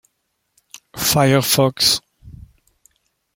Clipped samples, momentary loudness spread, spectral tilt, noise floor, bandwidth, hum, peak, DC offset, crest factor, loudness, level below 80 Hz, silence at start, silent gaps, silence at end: under 0.1%; 7 LU; -3.5 dB/octave; -71 dBFS; 16.5 kHz; none; -2 dBFS; under 0.1%; 20 dB; -16 LUFS; -50 dBFS; 0.95 s; none; 1.05 s